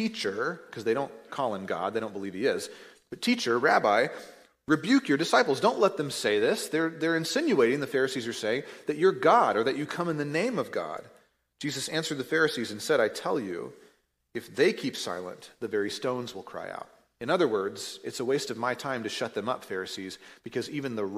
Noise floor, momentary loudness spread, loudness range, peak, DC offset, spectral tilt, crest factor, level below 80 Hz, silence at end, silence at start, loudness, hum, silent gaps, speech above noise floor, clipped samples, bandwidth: -63 dBFS; 15 LU; 7 LU; -8 dBFS; under 0.1%; -4 dB/octave; 20 dB; -74 dBFS; 0 s; 0 s; -28 LUFS; none; none; 35 dB; under 0.1%; 15.5 kHz